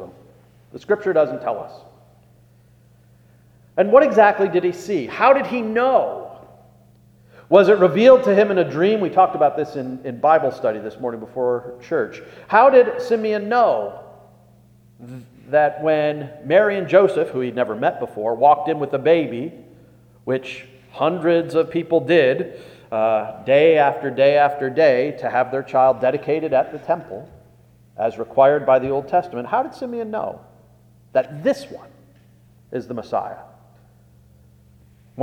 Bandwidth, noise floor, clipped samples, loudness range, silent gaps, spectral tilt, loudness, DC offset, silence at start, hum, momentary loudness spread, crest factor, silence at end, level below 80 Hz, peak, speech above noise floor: 9.2 kHz; -52 dBFS; under 0.1%; 9 LU; none; -7 dB/octave; -18 LUFS; under 0.1%; 0 s; none; 15 LU; 20 dB; 0 s; -62 dBFS; 0 dBFS; 34 dB